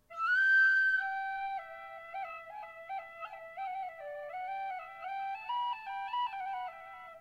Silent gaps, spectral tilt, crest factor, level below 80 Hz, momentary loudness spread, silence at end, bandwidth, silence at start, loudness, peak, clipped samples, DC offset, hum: none; -0.5 dB/octave; 14 dB; -78 dBFS; 20 LU; 0 s; 8.2 kHz; 0.1 s; -33 LUFS; -20 dBFS; under 0.1%; under 0.1%; none